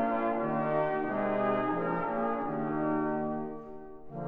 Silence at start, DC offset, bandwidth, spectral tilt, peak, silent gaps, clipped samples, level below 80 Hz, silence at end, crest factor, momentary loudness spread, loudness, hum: 0 s; 0.3%; 4.9 kHz; -10 dB/octave; -18 dBFS; none; under 0.1%; -58 dBFS; 0 s; 14 dB; 12 LU; -31 LUFS; none